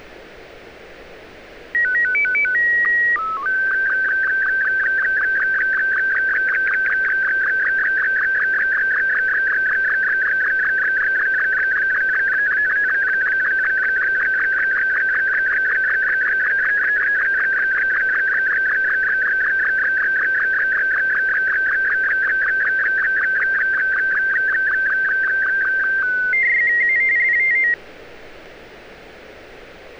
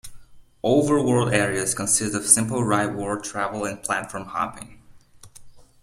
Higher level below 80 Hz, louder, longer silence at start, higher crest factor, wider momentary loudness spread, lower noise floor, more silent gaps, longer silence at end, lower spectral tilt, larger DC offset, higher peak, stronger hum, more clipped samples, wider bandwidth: about the same, -52 dBFS vs -52 dBFS; first, -16 LUFS vs -22 LUFS; about the same, 0 s vs 0.05 s; second, 6 dB vs 24 dB; second, 2 LU vs 11 LU; second, -40 dBFS vs -48 dBFS; neither; second, 0 s vs 0.25 s; about the same, -3 dB/octave vs -4 dB/octave; neither; second, -12 dBFS vs 0 dBFS; neither; neither; second, 7 kHz vs 15.5 kHz